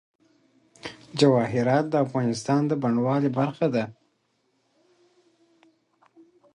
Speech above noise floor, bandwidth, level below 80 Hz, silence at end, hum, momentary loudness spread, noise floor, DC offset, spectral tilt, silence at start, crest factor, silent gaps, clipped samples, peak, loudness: 48 dB; 10.5 kHz; -66 dBFS; 2.6 s; none; 15 LU; -71 dBFS; under 0.1%; -6.5 dB/octave; 0.85 s; 20 dB; none; under 0.1%; -6 dBFS; -24 LUFS